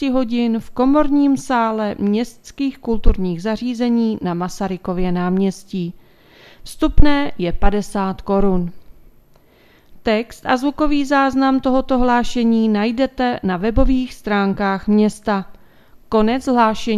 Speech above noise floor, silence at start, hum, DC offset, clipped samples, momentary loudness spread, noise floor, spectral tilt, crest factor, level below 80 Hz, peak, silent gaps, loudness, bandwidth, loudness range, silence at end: 35 dB; 0 s; none; under 0.1%; under 0.1%; 7 LU; -51 dBFS; -6.5 dB/octave; 16 dB; -28 dBFS; 0 dBFS; none; -18 LUFS; 13 kHz; 4 LU; 0 s